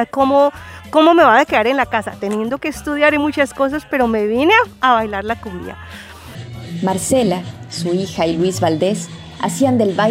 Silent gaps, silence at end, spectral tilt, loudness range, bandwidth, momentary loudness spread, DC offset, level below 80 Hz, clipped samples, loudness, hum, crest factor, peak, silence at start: none; 0 s; -5 dB/octave; 6 LU; 16 kHz; 18 LU; under 0.1%; -46 dBFS; under 0.1%; -16 LUFS; none; 16 dB; 0 dBFS; 0 s